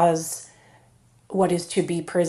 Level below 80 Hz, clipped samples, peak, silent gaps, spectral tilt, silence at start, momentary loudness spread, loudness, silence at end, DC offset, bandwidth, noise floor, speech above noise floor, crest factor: -62 dBFS; under 0.1%; -8 dBFS; none; -5.5 dB/octave; 0 s; 12 LU; -25 LUFS; 0 s; under 0.1%; 13.5 kHz; -57 dBFS; 35 dB; 18 dB